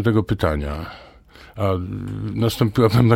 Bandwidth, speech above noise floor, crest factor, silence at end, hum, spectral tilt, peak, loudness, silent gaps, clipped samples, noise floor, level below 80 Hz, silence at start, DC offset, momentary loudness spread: 16.5 kHz; 27 dB; 16 dB; 0 s; none; -7.5 dB/octave; -4 dBFS; -21 LUFS; none; under 0.1%; -46 dBFS; -38 dBFS; 0 s; under 0.1%; 17 LU